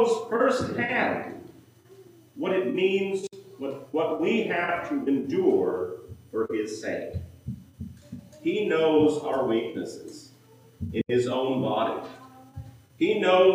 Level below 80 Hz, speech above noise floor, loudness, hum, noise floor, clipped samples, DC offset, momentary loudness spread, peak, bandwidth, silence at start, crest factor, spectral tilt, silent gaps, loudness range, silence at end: -56 dBFS; 29 dB; -26 LUFS; none; -54 dBFS; under 0.1%; under 0.1%; 20 LU; -8 dBFS; 15.5 kHz; 0 s; 18 dB; -6 dB/octave; none; 4 LU; 0 s